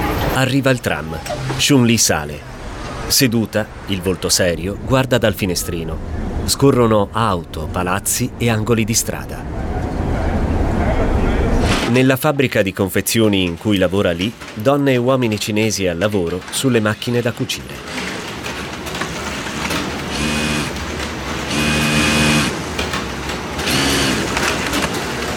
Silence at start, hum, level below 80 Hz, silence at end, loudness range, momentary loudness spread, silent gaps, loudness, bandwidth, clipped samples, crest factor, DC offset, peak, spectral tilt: 0 s; none; -30 dBFS; 0 s; 5 LU; 10 LU; none; -17 LUFS; 19.5 kHz; under 0.1%; 14 dB; under 0.1%; -2 dBFS; -4 dB/octave